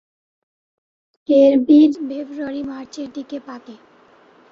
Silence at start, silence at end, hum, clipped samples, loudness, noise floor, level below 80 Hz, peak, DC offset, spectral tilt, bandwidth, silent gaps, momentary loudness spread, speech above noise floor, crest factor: 1.3 s; 0.75 s; none; under 0.1%; -16 LUFS; -51 dBFS; -64 dBFS; -2 dBFS; under 0.1%; -6 dB/octave; 7.2 kHz; none; 22 LU; 34 dB; 16 dB